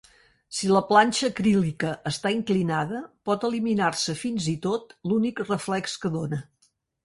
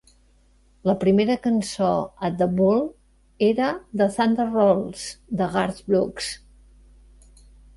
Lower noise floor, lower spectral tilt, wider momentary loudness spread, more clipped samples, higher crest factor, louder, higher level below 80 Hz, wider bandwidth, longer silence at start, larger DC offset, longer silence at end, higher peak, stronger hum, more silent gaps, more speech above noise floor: first, -68 dBFS vs -58 dBFS; about the same, -5 dB/octave vs -6 dB/octave; about the same, 10 LU vs 11 LU; neither; about the same, 20 dB vs 18 dB; second, -25 LUFS vs -22 LUFS; second, -60 dBFS vs -52 dBFS; about the same, 11.5 kHz vs 11.5 kHz; second, 0.5 s vs 0.85 s; neither; second, 0.6 s vs 1.4 s; about the same, -6 dBFS vs -6 dBFS; neither; neither; first, 43 dB vs 36 dB